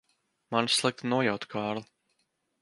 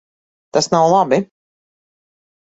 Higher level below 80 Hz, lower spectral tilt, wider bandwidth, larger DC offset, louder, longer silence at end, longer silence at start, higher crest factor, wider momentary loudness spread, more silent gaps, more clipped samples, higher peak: second, -72 dBFS vs -60 dBFS; about the same, -3.5 dB/octave vs -4.5 dB/octave; first, 11.5 kHz vs 8.2 kHz; neither; second, -29 LUFS vs -15 LUFS; second, 0.8 s vs 1.2 s; about the same, 0.5 s vs 0.55 s; about the same, 22 dB vs 18 dB; about the same, 8 LU vs 8 LU; neither; neither; second, -10 dBFS vs -2 dBFS